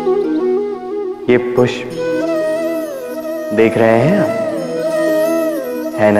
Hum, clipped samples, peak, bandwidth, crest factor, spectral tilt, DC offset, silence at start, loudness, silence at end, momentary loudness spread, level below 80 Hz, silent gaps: none; under 0.1%; 0 dBFS; 15.5 kHz; 14 dB; -6.5 dB/octave; under 0.1%; 0 s; -16 LUFS; 0 s; 10 LU; -54 dBFS; none